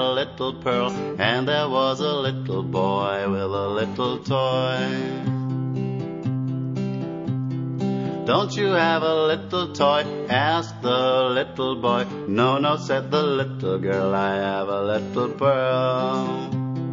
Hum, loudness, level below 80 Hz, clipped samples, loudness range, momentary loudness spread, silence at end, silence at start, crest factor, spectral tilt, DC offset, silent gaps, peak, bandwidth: none; -23 LUFS; -62 dBFS; under 0.1%; 4 LU; 7 LU; 0 s; 0 s; 20 dB; -6.5 dB/octave; under 0.1%; none; -4 dBFS; 7.6 kHz